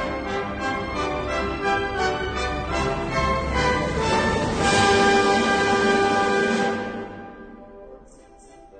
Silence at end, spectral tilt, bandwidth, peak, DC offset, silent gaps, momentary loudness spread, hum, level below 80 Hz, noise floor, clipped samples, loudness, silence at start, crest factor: 0 s; -4.5 dB/octave; 9.4 kHz; -6 dBFS; under 0.1%; none; 11 LU; none; -38 dBFS; -48 dBFS; under 0.1%; -22 LUFS; 0 s; 16 dB